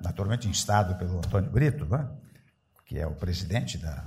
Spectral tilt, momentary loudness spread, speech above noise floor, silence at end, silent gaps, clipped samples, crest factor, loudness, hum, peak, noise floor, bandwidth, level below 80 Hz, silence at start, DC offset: -5.5 dB/octave; 10 LU; 36 dB; 0 s; none; under 0.1%; 18 dB; -28 LUFS; none; -10 dBFS; -63 dBFS; 15.5 kHz; -42 dBFS; 0 s; under 0.1%